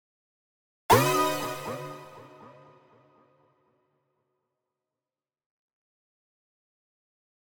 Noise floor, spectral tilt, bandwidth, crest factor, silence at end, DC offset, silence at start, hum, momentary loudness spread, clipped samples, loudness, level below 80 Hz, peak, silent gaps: under -90 dBFS; -4 dB/octave; over 20 kHz; 26 dB; 5.1 s; under 0.1%; 0.9 s; none; 26 LU; under 0.1%; -25 LUFS; -64 dBFS; -6 dBFS; none